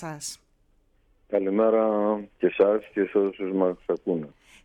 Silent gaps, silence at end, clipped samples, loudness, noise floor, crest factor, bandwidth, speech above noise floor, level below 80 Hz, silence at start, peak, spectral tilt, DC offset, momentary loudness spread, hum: none; 0.35 s; under 0.1%; -25 LUFS; -64 dBFS; 18 dB; 13.5 kHz; 40 dB; -64 dBFS; 0 s; -8 dBFS; -6 dB/octave; under 0.1%; 14 LU; none